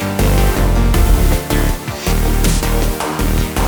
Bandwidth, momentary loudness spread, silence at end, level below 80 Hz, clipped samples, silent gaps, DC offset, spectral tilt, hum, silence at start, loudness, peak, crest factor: over 20 kHz; 5 LU; 0 s; -16 dBFS; under 0.1%; none; under 0.1%; -5 dB/octave; none; 0 s; -16 LUFS; 0 dBFS; 12 dB